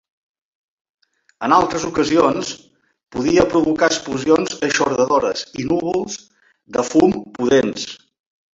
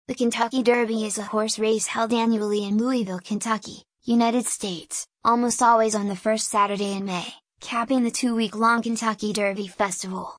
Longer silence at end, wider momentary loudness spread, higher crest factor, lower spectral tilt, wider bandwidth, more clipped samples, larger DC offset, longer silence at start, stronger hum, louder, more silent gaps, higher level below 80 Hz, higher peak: first, 0.6 s vs 0 s; first, 13 LU vs 8 LU; about the same, 18 dB vs 16 dB; about the same, -4.5 dB/octave vs -3.5 dB/octave; second, 8 kHz vs 10.5 kHz; neither; neither; first, 1.4 s vs 0.1 s; neither; first, -18 LUFS vs -23 LUFS; neither; first, -50 dBFS vs -66 dBFS; first, -2 dBFS vs -6 dBFS